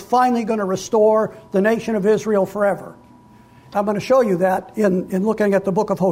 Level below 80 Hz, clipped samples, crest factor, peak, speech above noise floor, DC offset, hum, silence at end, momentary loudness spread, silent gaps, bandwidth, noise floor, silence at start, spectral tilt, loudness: -56 dBFS; under 0.1%; 12 dB; -6 dBFS; 29 dB; under 0.1%; none; 0 s; 6 LU; none; 16 kHz; -47 dBFS; 0 s; -6.5 dB/octave; -19 LUFS